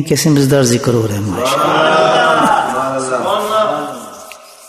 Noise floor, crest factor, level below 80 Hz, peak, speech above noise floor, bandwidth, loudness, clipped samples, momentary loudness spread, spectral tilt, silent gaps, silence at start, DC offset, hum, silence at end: -35 dBFS; 14 dB; -48 dBFS; 0 dBFS; 23 dB; 14 kHz; -13 LUFS; under 0.1%; 14 LU; -4.5 dB/octave; none; 0 s; under 0.1%; none; 0 s